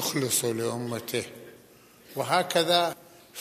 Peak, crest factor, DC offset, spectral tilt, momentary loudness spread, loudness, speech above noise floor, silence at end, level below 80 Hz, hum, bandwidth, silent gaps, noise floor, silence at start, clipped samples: -8 dBFS; 22 dB; under 0.1%; -3 dB/octave; 19 LU; -27 LUFS; 28 dB; 0 s; -74 dBFS; none; 15 kHz; none; -55 dBFS; 0 s; under 0.1%